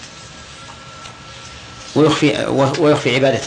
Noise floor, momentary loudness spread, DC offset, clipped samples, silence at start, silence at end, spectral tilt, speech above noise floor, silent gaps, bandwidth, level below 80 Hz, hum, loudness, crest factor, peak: -36 dBFS; 21 LU; under 0.1%; under 0.1%; 0 s; 0 s; -5.5 dB/octave; 22 dB; none; 10 kHz; -48 dBFS; none; -15 LUFS; 16 dB; -2 dBFS